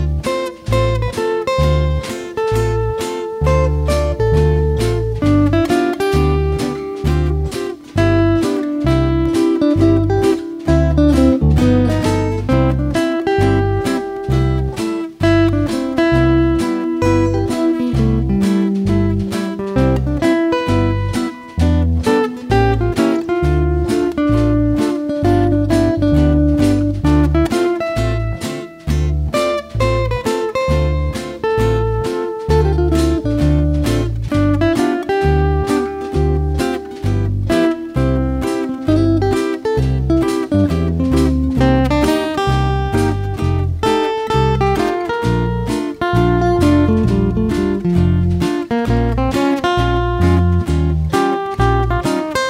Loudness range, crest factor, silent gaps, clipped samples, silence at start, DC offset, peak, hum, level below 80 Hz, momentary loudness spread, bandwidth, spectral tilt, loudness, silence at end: 3 LU; 14 dB; none; under 0.1%; 0 s; under 0.1%; 0 dBFS; none; -24 dBFS; 6 LU; 15.5 kHz; -7 dB/octave; -16 LUFS; 0 s